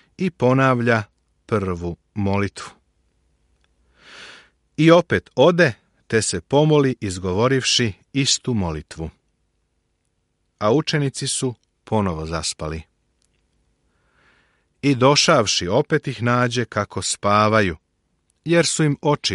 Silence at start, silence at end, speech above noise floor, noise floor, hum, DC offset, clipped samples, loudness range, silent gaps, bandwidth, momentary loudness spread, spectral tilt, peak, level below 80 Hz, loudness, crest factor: 0.2 s; 0 s; 51 dB; -70 dBFS; none; under 0.1%; under 0.1%; 9 LU; none; 11.5 kHz; 15 LU; -4.5 dB/octave; -2 dBFS; -48 dBFS; -19 LUFS; 20 dB